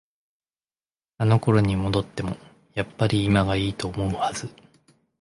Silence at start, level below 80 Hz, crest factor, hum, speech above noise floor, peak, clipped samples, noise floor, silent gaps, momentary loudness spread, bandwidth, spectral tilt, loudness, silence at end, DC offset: 1.2 s; -44 dBFS; 18 dB; none; over 67 dB; -6 dBFS; under 0.1%; under -90 dBFS; none; 13 LU; 11.5 kHz; -6.5 dB/octave; -24 LUFS; 0.7 s; under 0.1%